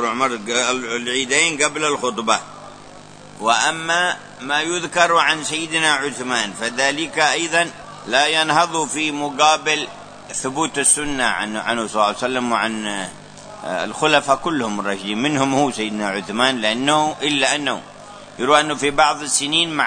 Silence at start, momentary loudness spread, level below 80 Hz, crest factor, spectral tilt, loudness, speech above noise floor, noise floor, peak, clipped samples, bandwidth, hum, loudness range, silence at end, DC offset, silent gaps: 0 s; 10 LU; -52 dBFS; 18 dB; -2 dB/octave; -18 LUFS; 21 dB; -40 dBFS; 0 dBFS; under 0.1%; 9.6 kHz; none; 3 LU; 0 s; under 0.1%; none